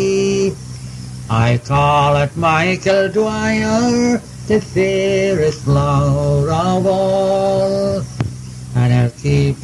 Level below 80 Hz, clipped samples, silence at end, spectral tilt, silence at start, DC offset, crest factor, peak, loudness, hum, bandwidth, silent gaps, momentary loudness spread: -36 dBFS; under 0.1%; 0 s; -6.5 dB/octave; 0 s; under 0.1%; 14 dB; 0 dBFS; -16 LUFS; none; 12 kHz; none; 9 LU